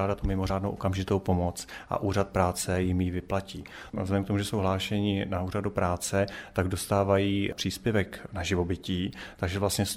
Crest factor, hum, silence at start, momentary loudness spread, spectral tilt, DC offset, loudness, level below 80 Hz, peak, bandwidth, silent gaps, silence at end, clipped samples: 18 dB; none; 0 s; 7 LU; -5.5 dB/octave; under 0.1%; -29 LUFS; -46 dBFS; -10 dBFS; 16 kHz; none; 0 s; under 0.1%